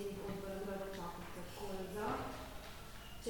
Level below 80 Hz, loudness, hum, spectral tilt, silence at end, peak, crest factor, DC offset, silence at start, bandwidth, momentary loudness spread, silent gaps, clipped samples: -56 dBFS; -46 LUFS; none; -5 dB/octave; 0 s; -26 dBFS; 18 dB; under 0.1%; 0 s; 19 kHz; 10 LU; none; under 0.1%